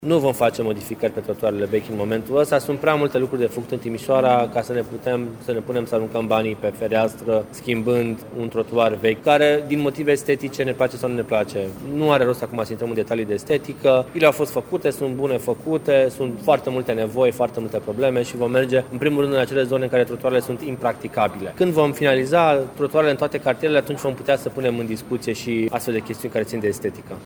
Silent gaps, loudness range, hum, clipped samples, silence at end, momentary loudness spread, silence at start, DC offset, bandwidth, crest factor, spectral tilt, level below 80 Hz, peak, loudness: none; 3 LU; none; under 0.1%; 0 s; 8 LU; 0 s; under 0.1%; over 20 kHz; 20 dB; -6 dB/octave; -56 dBFS; 0 dBFS; -21 LUFS